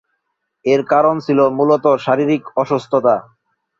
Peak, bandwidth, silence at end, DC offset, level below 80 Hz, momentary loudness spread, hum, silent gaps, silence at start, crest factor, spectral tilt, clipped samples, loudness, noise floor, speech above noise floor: -2 dBFS; 7.6 kHz; 0.6 s; under 0.1%; -62 dBFS; 5 LU; none; none; 0.65 s; 14 dB; -7.5 dB/octave; under 0.1%; -15 LUFS; -73 dBFS; 58 dB